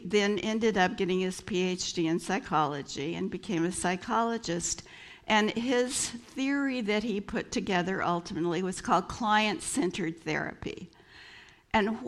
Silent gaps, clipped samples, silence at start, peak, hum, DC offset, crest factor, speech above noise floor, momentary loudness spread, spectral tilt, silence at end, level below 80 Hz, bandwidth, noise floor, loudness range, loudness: none; under 0.1%; 0 s; -12 dBFS; none; under 0.1%; 18 dB; 24 dB; 9 LU; -4 dB/octave; 0 s; -58 dBFS; 13.5 kHz; -53 dBFS; 1 LU; -30 LUFS